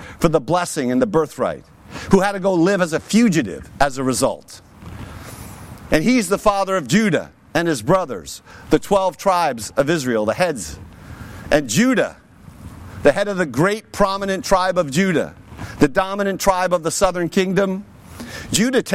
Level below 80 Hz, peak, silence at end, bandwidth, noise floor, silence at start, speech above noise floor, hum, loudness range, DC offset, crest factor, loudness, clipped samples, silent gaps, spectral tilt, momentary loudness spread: -40 dBFS; -2 dBFS; 0 s; 16.5 kHz; -40 dBFS; 0 s; 22 dB; none; 2 LU; under 0.1%; 18 dB; -18 LUFS; under 0.1%; none; -5 dB/octave; 19 LU